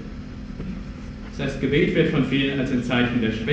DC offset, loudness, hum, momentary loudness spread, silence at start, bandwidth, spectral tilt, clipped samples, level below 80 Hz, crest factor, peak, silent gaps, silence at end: under 0.1%; -22 LUFS; none; 16 LU; 0 s; 8.4 kHz; -7 dB/octave; under 0.1%; -38 dBFS; 16 dB; -6 dBFS; none; 0 s